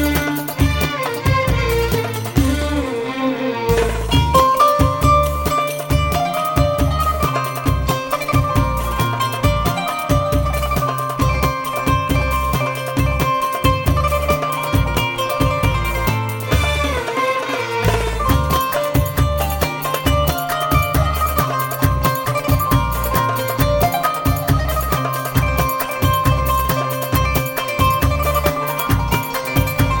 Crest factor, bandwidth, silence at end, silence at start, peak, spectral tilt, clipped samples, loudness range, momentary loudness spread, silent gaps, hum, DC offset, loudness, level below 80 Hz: 16 dB; over 20 kHz; 0 s; 0 s; 0 dBFS; -5.5 dB/octave; under 0.1%; 2 LU; 4 LU; none; none; under 0.1%; -18 LUFS; -24 dBFS